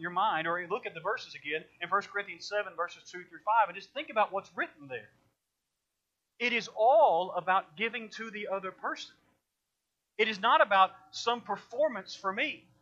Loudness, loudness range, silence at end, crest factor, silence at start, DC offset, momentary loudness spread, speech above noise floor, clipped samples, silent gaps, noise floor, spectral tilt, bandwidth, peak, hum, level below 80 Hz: -31 LUFS; 5 LU; 0.25 s; 22 dB; 0 s; under 0.1%; 14 LU; 54 dB; under 0.1%; none; -85 dBFS; -3.5 dB/octave; 7.8 kHz; -10 dBFS; none; -84 dBFS